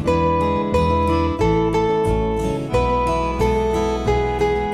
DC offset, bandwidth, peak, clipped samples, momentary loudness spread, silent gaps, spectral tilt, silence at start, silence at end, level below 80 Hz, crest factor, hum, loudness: under 0.1%; 14 kHz; -4 dBFS; under 0.1%; 3 LU; none; -7 dB/octave; 0 s; 0 s; -28 dBFS; 14 dB; none; -19 LUFS